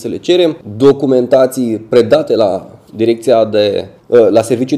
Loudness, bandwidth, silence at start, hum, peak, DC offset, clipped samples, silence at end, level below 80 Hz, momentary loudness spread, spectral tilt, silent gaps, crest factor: -11 LUFS; 14.5 kHz; 0 s; none; 0 dBFS; under 0.1%; 0.4%; 0 s; -54 dBFS; 7 LU; -6 dB/octave; none; 12 dB